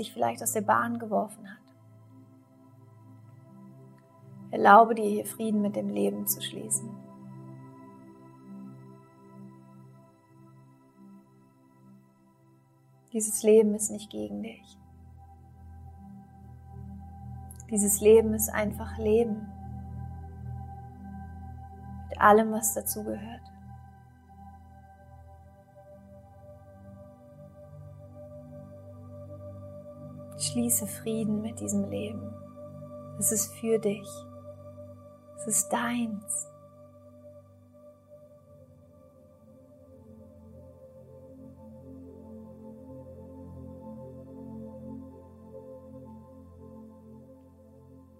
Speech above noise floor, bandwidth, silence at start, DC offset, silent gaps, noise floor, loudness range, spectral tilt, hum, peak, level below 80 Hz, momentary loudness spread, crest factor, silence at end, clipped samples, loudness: 35 dB; 16 kHz; 0 s; under 0.1%; none; -61 dBFS; 24 LU; -4 dB/octave; none; -4 dBFS; -60 dBFS; 26 LU; 28 dB; 0.2 s; under 0.1%; -27 LUFS